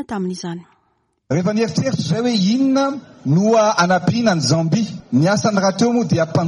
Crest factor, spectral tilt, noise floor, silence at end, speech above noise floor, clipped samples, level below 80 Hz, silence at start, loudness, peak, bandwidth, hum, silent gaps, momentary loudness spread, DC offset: 14 dB; -5.5 dB/octave; -65 dBFS; 0 s; 48 dB; under 0.1%; -56 dBFS; 0 s; -17 LUFS; -4 dBFS; 11 kHz; none; none; 10 LU; under 0.1%